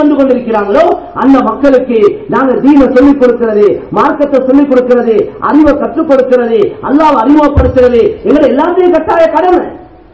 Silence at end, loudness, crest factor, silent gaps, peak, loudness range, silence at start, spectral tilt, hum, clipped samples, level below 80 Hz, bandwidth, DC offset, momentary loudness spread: 0.3 s; -8 LUFS; 8 dB; none; 0 dBFS; 1 LU; 0 s; -8 dB/octave; none; 7%; -26 dBFS; 8 kHz; 0.5%; 5 LU